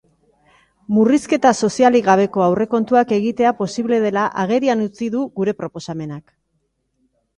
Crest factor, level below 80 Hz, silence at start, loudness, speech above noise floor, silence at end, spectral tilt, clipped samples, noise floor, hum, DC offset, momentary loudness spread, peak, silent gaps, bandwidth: 18 dB; -58 dBFS; 0.9 s; -17 LUFS; 52 dB; 1.2 s; -6 dB/octave; under 0.1%; -69 dBFS; none; under 0.1%; 13 LU; 0 dBFS; none; 11 kHz